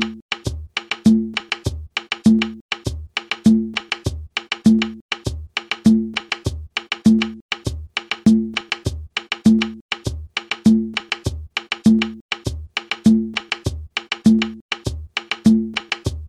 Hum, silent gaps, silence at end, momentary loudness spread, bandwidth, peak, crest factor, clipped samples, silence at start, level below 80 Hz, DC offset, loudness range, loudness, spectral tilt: none; 0.22-0.29 s, 2.61-2.69 s, 5.01-5.09 s, 7.41-7.49 s, 9.81-9.89 s, 12.21-12.29 s, 14.61-14.69 s; 0 s; 10 LU; 11.5 kHz; -2 dBFS; 18 dB; under 0.1%; 0 s; -38 dBFS; under 0.1%; 1 LU; -20 LUFS; -5 dB/octave